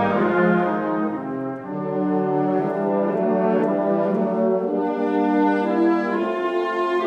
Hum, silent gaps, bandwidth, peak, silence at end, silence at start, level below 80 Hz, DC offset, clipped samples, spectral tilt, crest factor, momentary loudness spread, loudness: none; none; 7.8 kHz; -6 dBFS; 0 s; 0 s; -64 dBFS; under 0.1%; under 0.1%; -9 dB/octave; 14 dB; 6 LU; -21 LUFS